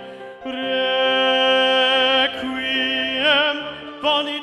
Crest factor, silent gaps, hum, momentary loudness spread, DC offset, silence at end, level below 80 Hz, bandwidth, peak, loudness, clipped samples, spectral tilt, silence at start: 14 dB; none; none; 12 LU; under 0.1%; 0 s; -60 dBFS; 11.5 kHz; -6 dBFS; -18 LUFS; under 0.1%; -2.5 dB/octave; 0 s